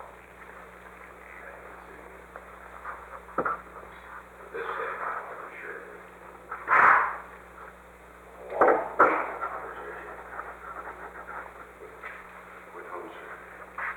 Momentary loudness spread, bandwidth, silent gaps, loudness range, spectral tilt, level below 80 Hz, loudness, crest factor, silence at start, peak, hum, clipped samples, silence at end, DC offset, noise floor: 24 LU; 19 kHz; none; 16 LU; -5.5 dB/octave; -60 dBFS; -28 LUFS; 24 dB; 0 s; -6 dBFS; 60 Hz at -60 dBFS; under 0.1%; 0 s; under 0.1%; -50 dBFS